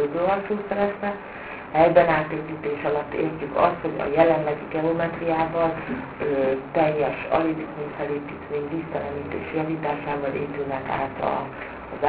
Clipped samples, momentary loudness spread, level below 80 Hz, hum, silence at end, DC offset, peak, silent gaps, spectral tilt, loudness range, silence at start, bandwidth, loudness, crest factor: under 0.1%; 11 LU; -52 dBFS; none; 0 s; under 0.1%; -2 dBFS; none; -10.5 dB/octave; 6 LU; 0 s; 4 kHz; -24 LUFS; 22 dB